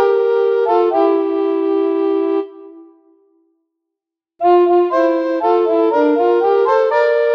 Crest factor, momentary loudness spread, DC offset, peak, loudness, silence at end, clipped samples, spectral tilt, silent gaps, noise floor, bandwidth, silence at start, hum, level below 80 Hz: 12 dB; 4 LU; under 0.1%; -2 dBFS; -15 LUFS; 0 s; under 0.1%; -5.5 dB/octave; none; -83 dBFS; 6.2 kHz; 0 s; none; -74 dBFS